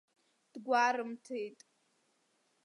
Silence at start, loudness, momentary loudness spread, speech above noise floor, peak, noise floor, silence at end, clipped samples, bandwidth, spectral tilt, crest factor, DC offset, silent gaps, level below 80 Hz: 0.55 s; -34 LUFS; 18 LU; 42 dB; -16 dBFS; -76 dBFS; 1.1 s; under 0.1%; 11.5 kHz; -3 dB/octave; 22 dB; under 0.1%; none; under -90 dBFS